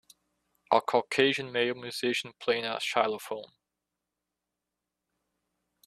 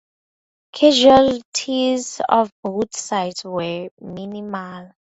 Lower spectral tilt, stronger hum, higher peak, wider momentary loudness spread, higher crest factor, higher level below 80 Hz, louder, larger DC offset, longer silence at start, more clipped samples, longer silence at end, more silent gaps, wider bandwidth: about the same, -3.5 dB/octave vs -4 dB/octave; neither; second, -8 dBFS vs 0 dBFS; second, 7 LU vs 19 LU; about the same, 24 dB vs 20 dB; second, -76 dBFS vs -54 dBFS; second, -29 LUFS vs -18 LUFS; neither; about the same, 0.7 s vs 0.75 s; neither; first, 2.4 s vs 0.15 s; second, none vs 1.45-1.52 s, 2.52-2.63 s, 3.91-3.97 s; first, 14 kHz vs 8.2 kHz